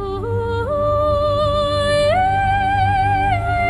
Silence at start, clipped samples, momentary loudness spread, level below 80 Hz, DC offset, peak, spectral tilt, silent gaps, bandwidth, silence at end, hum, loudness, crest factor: 0 s; under 0.1%; 5 LU; -30 dBFS; under 0.1%; -6 dBFS; -6 dB/octave; none; 11 kHz; 0 s; none; -17 LUFS; 10 dB